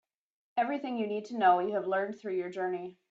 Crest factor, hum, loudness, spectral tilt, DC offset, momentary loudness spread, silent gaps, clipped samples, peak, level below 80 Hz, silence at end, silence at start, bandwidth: 20 dB; none; -31 LUFS; -6.5 dB/octave; under 0.1%; 10 LU; none; under 0.1%; -12 dBFS; -80 dBFS; 0.2 s; 0.55 s; 7.6 kHz